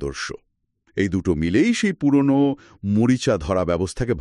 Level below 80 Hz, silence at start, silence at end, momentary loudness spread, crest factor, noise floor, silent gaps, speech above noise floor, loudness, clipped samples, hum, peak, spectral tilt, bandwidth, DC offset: -42 dBFS; 0 s; 0 s; 12 LU; 14 dB; -65 dBFS; none; 45 dB; -21 LUFS; under 0.1%; none; -6 dBFS; -6 dB/octave; 11 kHz; under 0.1%